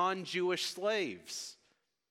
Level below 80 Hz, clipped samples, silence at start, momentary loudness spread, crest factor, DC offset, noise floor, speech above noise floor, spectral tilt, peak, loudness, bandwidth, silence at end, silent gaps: -90 dBFS; under 0.1%; 0 s; 9 LU; 18 dB; under 0.1%; -76 dBFS; 40 dB; -3 dB/octave; -20 dBFS; -35 LUFS; 15.5 kHz; 0.55 s; none